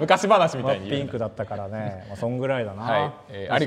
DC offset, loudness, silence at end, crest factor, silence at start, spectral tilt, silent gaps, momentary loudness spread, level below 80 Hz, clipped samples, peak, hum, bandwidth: under 0.1%; -25 LUFS; 0 s; 22 dB; 0 s; -5.5 dB/octave; none; 13 LU; -60 dBFS; under 0.1%; -2 dBFS; none; 13.5 kHz